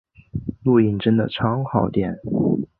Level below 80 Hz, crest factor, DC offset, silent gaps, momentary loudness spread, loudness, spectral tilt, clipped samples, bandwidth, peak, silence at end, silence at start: -46 dBFS; 18 dB; under 0.1%; none; 12 LU; -21 LUFS; -11.5 dB/octave; under 0.1%; 4.5 kHz; -2 dBFS; 0.15 s; 0.35 s